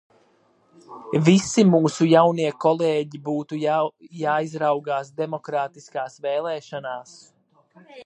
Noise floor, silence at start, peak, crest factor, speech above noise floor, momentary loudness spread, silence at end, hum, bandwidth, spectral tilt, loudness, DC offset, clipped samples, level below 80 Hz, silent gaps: -61 dBFS; 0.9 s; -2 dBFS; 20 dB; 39 dB; 15 LU; 0 s; none; 9.8 kHz; -6 dB/octave; -22 LUFS; under 0.1%; under 0.1%; -66 dBFS; none